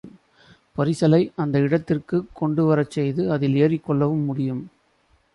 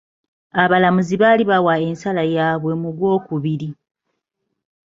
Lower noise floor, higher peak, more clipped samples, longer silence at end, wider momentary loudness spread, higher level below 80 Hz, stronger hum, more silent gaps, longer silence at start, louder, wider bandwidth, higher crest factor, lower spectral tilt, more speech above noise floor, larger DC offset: second, -62 dBFS vs -76 dBFS; second, -6 dBFS vs 0 dBFS; neither; second, 0.65 s vs 1.15 s; about the same, 8 LU vs 10 LU; about the same, -58 dBFS vs -58 dBFS; neither; neither; second, 0.05 s vs 0.55 s; second, -22 LUFS vs -17 LUFS; first, 11.5 kHz vs 7.6 kHz; about the same, 16 dB vs 18 dB; first, -8.5 dB/octave vs -7 dB/octave; second, 42 dB vs 59 dB; neither